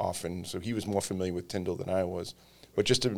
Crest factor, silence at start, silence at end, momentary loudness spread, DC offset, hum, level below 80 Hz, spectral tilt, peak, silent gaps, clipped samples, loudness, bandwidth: 20 dB; 0 s; 0 s; 8 LU; under 0.1%; none; -58 dBFS; -4.5 dB/octave; -12 dBFS; none; under 0.1%; -32 LUFS; 18.5 kHz